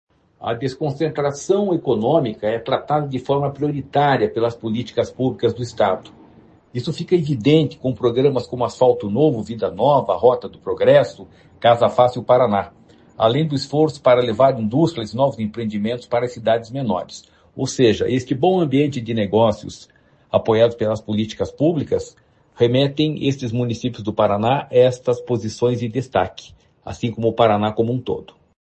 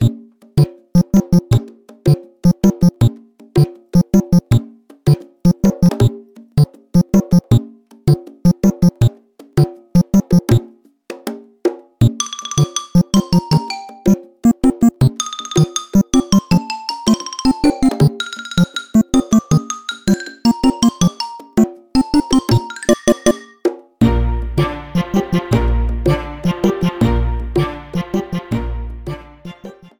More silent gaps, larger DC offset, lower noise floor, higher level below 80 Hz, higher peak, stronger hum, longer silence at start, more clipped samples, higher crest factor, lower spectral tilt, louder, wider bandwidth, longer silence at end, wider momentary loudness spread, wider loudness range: neither; neither; first, -49 dBFS vs -41 dBFS; second, -56 dBFS vs -28 dBFS; about the same, 0 dBFS vs 0 dBFS; neither; first, 0.4 s vs 0 s; neither; about the same, 18 dB vs 16 dB; about the same, -6.5 dB/octave vs -6.5 dB/octave; second, -19 LUFS vs -16 LUFS; second, 8.6 kHz vs 20 kHz; first, 0.5 s vs 0.3 s; about the same, 10 LU vs 8 LU; about the same, 4 LU vs 2 LU